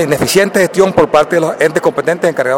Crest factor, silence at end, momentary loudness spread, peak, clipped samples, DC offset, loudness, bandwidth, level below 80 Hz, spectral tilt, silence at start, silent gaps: 12 dB; 0 s; 4 LU; 0 dBFS; under 0.1%; under 0.1%; -11 LUFS; 17 kHz; -46 dBFS; -4.5 dB/octave; 0 s; none